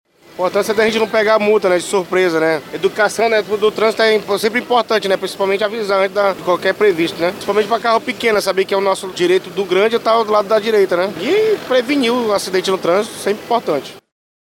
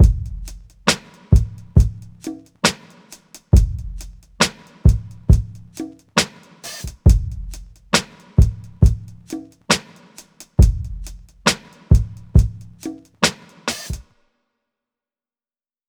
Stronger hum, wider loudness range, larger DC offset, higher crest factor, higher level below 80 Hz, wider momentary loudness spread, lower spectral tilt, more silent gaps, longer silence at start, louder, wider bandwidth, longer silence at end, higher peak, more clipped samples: neither; about the same, 1 LU vs 2 LU; neither; about the same, 16 dB vs 20 dB; second, -60 dBFS vs -22 dBFS; second, 4 LU vs 17 LU; about the same, -4 dB/octave vs -4.5 dB/octave; neither; first, 0.35 s vs 0 s; first, -15 LUFS vs -19 LUFS; about the same, 17 kHz vs 16.5 kHz; second, 0.4 s vs 1.85 s; about the same, 0 dBFS vs 0 dBFS; neither